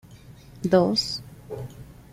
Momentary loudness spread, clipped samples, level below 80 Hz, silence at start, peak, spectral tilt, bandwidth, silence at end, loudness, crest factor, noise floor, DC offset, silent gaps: 20 LU; under 0.1%; -52 dBFS; 0.1 s; -6 dBFS; -5.5 dB/octave; 16 kHz; 0.2 s; -23 LUFS; 20 dB; -47 dBFS; under 0.1%; none